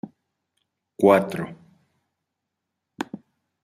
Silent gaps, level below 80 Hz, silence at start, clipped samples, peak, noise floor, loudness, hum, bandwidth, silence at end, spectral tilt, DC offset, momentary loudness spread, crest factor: none; -70 dBFS; 0.05 s; under 0.1%; -2 dBFS; -82 dBFS; -20 LUFS; none; 15 kHz; 0.45 s; -7 dB/octave; under 0.1%; 23 LU; 24 dB